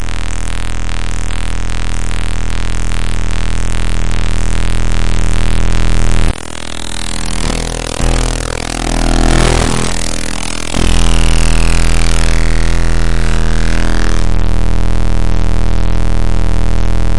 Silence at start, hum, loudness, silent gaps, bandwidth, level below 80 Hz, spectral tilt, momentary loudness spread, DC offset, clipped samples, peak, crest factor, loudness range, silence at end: 0 s; none; -16 LUFS; none; 11.5 kHz; -14 dBFS; -4.5 dB/octave; 7 LU; 30%; under 0.1%; 0 dBFS; 14 dB; 5 LU; 0 s